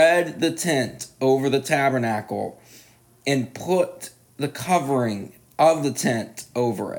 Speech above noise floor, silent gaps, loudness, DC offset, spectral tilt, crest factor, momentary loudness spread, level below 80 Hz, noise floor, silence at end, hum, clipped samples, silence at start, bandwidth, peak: 30 dB; none; -23 LUFS; under 0.1%; -5 dB/octave; 18 dB; 12 LU; -66 dBFS; -52 dBFS; 0 s; none; under 0.1%; 0 s; 19.5 kHz; -6 dBFS